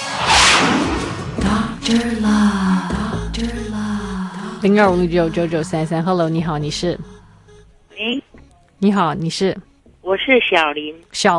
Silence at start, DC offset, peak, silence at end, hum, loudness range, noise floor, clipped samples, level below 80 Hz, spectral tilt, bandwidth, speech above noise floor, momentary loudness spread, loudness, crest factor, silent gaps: 0 s; under 0.1%; 0 dBFS; 0 s; none; 5 LU; -46 dBFS; under 0.1%; -36 dBFS; -4.5 dB/octave; 11.5 kHz; 30 dB; 11 LU; -17 LUFS; 18 dB; none